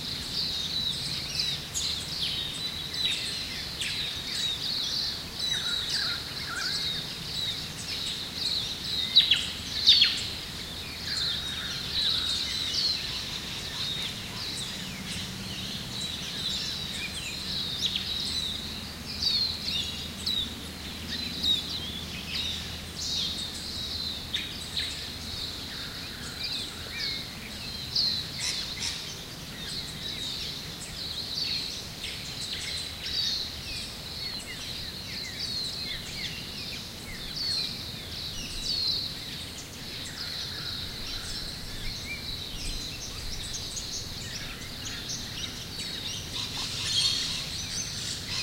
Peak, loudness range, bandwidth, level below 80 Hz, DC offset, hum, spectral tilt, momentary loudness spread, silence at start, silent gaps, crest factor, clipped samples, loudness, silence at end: -6 dBFS; 9 LU; 16 kHz; -48 dBFS; under 0.1%; none; -1.5 dB/octave; 10 LU; 0 s; none; 26 dB; under 0.1%; -29 LUFS; 0 s